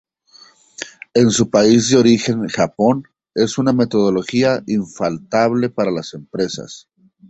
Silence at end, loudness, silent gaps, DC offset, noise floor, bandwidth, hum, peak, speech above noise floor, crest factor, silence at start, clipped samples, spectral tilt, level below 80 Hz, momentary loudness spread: 0.5 s; -16 LUFS; none; under 0.1%; -48 dBFS; 8.2 kHz; none; -2 dBFS; 33 dB; 16 dB; 0.8 s; under 0.1%; -5 dB/octave; -54 dBFS; 14 LU